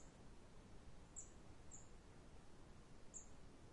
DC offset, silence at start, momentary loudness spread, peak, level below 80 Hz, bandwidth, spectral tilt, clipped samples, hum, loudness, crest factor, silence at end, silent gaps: under 0.1%; 0 s; 8 LU; -42 dBFS; -66 dBFS; 11 kHz; -4 dB/octave; under 0.1%; none; -62 LUFS; 18 dB; 0 s; none